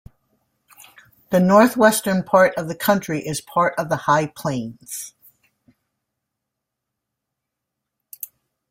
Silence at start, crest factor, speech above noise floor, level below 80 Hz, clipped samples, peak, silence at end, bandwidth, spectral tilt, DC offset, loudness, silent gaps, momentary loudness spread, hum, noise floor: 1.3 s; 20 dB; 63 dB; -60 dBFS; under 0.1%; -2 dBFS; 3.6 s; 16.5 kHz; -5 dB/octave; under 0.1%; -18 LUFS; none; 20 LU; none; -82 dBFS